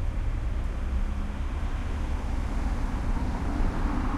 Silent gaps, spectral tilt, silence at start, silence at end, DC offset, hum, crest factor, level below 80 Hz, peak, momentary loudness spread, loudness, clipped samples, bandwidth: none; -7 dB/octave; 0 s; 0 s; under 0.1%; none; 12 dB; -28 dBFS; -14 dBFS; 3 LU; -32 LUFS; under 0.1%; 10 kHz